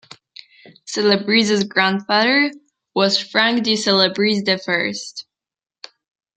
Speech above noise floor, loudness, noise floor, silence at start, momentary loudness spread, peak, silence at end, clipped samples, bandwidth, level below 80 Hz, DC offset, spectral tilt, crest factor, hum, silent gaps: 72 dB; -17 LUFS; -90 dBFS; 0.85 s; 10 LU; -2 dBFS; 1.15 s; under 0.1%; 9.2 kHz; -66 dBFS; under 0.1%; -3.5 dB/octave; 18 dB; none; none